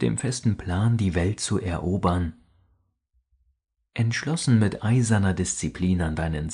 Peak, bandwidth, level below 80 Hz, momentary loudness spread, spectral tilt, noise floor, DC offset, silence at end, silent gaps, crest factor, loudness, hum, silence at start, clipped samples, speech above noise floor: -8 dBFS; 10.5 kHz; -42 dBFS; 6 LU; -5.5 dB/octave; -71 dBFS; under 0.1%; 0 s; none; 16 dB; -24 LUFS; none; 0 s; under 0.1%; 47 dB